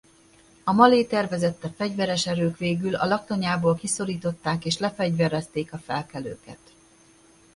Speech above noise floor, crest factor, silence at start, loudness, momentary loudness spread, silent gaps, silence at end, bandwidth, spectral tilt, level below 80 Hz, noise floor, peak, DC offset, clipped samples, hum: 31 dB; 22 dB; 0.65 s; -24 LUFS; 13 LU; none; 1 s; 11.5 kHz; -5 dB/octave; -58 dBFS; -56 dBFS; -2 dBFS; under 0.1%; under 0.1%; none